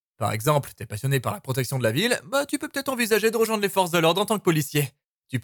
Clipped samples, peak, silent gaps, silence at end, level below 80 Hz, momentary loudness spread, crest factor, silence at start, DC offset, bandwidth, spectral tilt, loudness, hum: under 0.1%; -8 dBFS; 5.06-5.23 s; 0 s; -62 dBFS; 7 LU; 18 dB; 0.2 s; under 0.1%; 19 kHz; -4.5 dB/octave; -24 LUFS; none